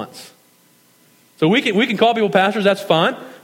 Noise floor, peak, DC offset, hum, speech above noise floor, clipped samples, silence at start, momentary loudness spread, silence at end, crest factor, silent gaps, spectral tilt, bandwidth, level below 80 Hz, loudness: -54 dBFS; 0 dBFS; under 0.1%; none; 38 dB; under 0.1%; 0 s; 5 LU; 0.1 s; 18 dB; none; -5.5 dB/octave; 17 kHz; -70 dBFS; -16 LUFS